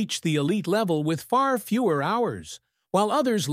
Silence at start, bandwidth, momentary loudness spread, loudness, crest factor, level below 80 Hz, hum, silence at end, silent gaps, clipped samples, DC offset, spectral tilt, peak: 0 s; 16 kHz; 6 LU; -24 LUFS; 16 dB; -66 dBFS; none; 0 s; none; under 0.1%; under 0.1%; -5.5 dB/octave; -8 dBFS